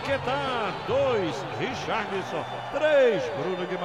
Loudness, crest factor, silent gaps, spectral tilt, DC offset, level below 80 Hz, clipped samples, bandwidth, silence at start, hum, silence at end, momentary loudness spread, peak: -26 LUFS; 16 dB; none; -5 dB/octave; 0.1%; -58 dBFS; under 0.1%; 10.5 kHz; 0 s; none; 0 s; 9 LU; -10 dBFS